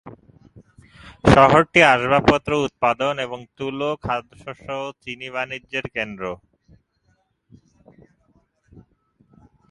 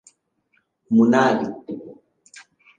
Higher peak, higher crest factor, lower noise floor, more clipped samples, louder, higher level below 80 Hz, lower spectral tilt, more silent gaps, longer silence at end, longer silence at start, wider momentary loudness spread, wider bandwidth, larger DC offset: first, 0 dBFS vs -4 dBFS; about the same, 22 dB vs 20 dB; about the same, -66 dBFS vs -68 dBFS; neither; about the same, -19 LUFS vs -19 LUFS; first, -44 dBFS vs -68 dBFS; about the same, -5.5 dB/octave vs -6.5 dB/octave; neither; first, 3.35 s vs 0.4 s; second, 0.05 s vs 0.9 s; about the same, 18 LU vs 19 LU; first, 11.5 kHz vs 9.2 kHz; neither